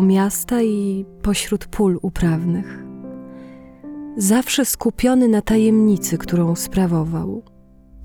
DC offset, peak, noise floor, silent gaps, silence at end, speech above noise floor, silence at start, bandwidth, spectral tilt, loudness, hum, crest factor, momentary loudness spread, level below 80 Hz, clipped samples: under 0.1%; -4 dBFS; -45 dBFS; none; 0 s; 27 dB; 0 s; 20 kHz; -5.5 dB/octave; -18 LUFS; none; 14 dB; 19 LU; -38 dBFS; under 0.1%